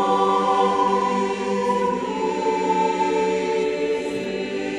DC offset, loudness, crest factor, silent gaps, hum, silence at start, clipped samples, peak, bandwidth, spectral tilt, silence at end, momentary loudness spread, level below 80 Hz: under 0.1%; -21 LUFS; 14 dB; none; none; 0 s; under 0.1%; -6 dBFS; 11 kHz; -5 dB/octave; 0 s; 6 LU; -56 dBFS